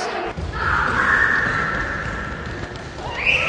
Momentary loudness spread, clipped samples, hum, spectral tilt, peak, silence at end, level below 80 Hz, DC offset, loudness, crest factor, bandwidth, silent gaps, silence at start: 14 LU; under 0.1%; none; -4.5 dB/octave; -4 dBFS; 0 s; -34 dBFS; under 0.1%; -20 LUFS; 18 dB; 10 kHz; none; 0 s